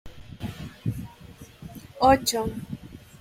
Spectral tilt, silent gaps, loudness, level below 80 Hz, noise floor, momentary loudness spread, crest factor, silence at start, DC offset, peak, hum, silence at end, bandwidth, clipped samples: -4.5 dB/octave; none; -25 LUFS; -46 dBFS; -47 dBFS; 26 LU; 22 dB; 0.05 s; under 0.1%; -6 dBFS; none; 0.2 s; 16 kHz; under 0.1%